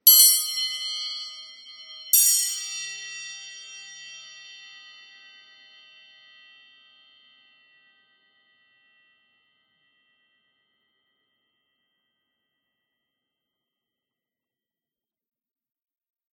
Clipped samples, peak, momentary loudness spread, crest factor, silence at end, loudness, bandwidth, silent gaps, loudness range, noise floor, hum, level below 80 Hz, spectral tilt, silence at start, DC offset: under 0.1%; -2 dBFS; 27 LU; 28 dB; 11.75 s; -20 LUFS; 16.5 kHz; none; 25 LU; under -90 dBFS; none; under -90 dBFS; 6.5 dB/octave; 0.05 s; under 0.1%